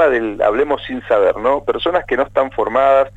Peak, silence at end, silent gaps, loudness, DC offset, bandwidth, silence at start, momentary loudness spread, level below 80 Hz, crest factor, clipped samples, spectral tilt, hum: -2 dBFS; 0.1 s; none; -16 LUFS; under 0.1%; 8 kHz; 0 s; 5 LU; -42 dBFS; 14 dB; under 0.1%; -6 dB/octave; 50 Hz at -45 dBFS